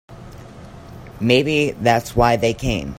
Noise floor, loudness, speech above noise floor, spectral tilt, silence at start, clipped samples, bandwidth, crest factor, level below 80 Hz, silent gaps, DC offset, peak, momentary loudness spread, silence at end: -38 dBFS; -18 LUFS; 21 dB; -5.5 dB/octave; 0.1 s; under 0.1%; 16.5 kHz; 20 dB; -36 dBFS; none; under 0.1%; 0 dBFS; 23 LU; 0 s